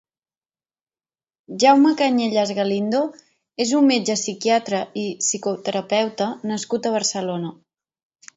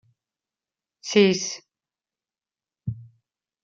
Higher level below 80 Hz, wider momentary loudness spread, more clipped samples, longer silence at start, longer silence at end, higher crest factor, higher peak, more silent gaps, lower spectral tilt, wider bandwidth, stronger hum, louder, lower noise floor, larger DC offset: about the same, -70 dBFS vs -66 dBFS; second, 11 LU vs 20 LU; neither; first, 1.5 s vs 1.05 s; first, 0.85 s vs 0.6 s; second, 18 dB vs 24 dB; about the same, -2 dBFS vs -4 dBFS; neither; about the same, -3.5 dB/octave vs -4.5 dB/octave; about the same, 8 kHz vs 7.6 kHz; neither; about the same, -20 LUFS vs -21 LUFS; about the same, under -90 dBFS vs under -90 dBFS; neither